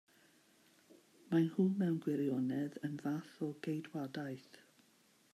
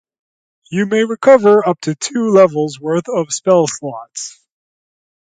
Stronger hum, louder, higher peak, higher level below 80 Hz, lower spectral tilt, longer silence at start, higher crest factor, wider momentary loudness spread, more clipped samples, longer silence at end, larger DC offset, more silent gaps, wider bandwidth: neither; second, -38 LUFS vs -14 LUFS; second, -22 dBFS vs 0 dBFS; second, -86 dBFS vs -64 dBFS; first, -8 dB/octave vs -5 dB/octave; first, 1.3 s vs 0.7 s; about the same, 18 dB vs 14 dB; second, 10 LU vs 16 LU; neither; about the same, 0.95 s vs 1 s; neither; neither; first, 14.5 kHz vs 9.4 kHz